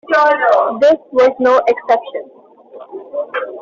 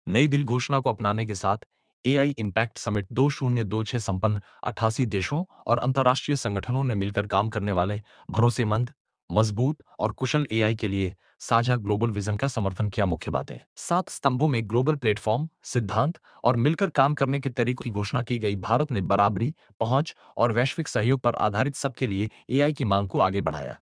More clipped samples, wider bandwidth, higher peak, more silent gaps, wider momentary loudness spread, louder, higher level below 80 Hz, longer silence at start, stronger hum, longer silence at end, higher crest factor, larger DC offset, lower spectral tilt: neither; second, 7.4 kHz vs 10.5 kHz; about the same, -2 dBFS vs -4 dBFS; second, none vs 1.66-1.70 s, 1.93-2.04 s, 9.00-9.05 s, 9.23-9.28 s, 13.66-13.76 s, 19.74-19.80 s; first, 17 LU vs 7 LU; first, -13 LUFS vs -26 LUFS; second, -60 dBFS vs -54 dBFS; about the same, 0.1 s vs 0.05 s; neither; about the same, 0 s vs 0.05 s; second, 12 dB vs 22 dB; neither; second, -4 dB/octave vs -6 dB/octave